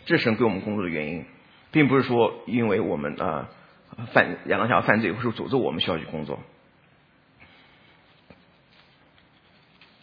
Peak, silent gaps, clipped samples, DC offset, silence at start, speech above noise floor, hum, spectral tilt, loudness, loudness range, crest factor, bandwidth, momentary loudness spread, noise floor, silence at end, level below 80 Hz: 0 dBFS; none; under 0.1%; under 0.1%; 0.05 s; 35 dB; none; -8.5 dB/octave; -24 LUFS; 10 LU; 26 dB; 5.2 kHz; 13 LU; -59 dBFS; 3.6 s; -60 dBFS